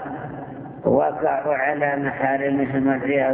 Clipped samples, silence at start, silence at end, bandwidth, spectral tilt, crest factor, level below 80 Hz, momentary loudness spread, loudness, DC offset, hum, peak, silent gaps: under 0.1%; 0 s; 0 s; 3.6 kHz; -11 dB/octave; 16 dB; -54 dBFS; 13 LU; -21 LUFS; under 0.1%; none; -4 dBFS; none